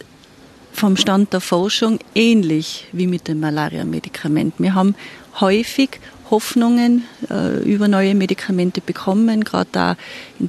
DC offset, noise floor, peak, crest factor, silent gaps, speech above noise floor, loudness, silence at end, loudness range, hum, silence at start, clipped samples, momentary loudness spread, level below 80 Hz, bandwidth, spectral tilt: under 0.1%; -45 dBFS; -2 dBFS; 16 dB; none; 28 dB; -17 LUFS; 0 s; 2 LU; none; 0.75 s; under 0.1%; 10 LU; -56 dBFS; 13 kHz; -5.5 dB/octave